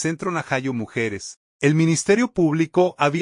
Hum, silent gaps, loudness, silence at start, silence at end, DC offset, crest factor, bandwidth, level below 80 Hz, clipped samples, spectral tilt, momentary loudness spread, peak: none; 1.37-1.59 s; -21 LUFS; 0 s; 0 s; under 0.1%; 16 dB; 11 kHz; -58 dBFS; under 0.1%; -5.5 dB/octave; 8 LU; -4 dBFS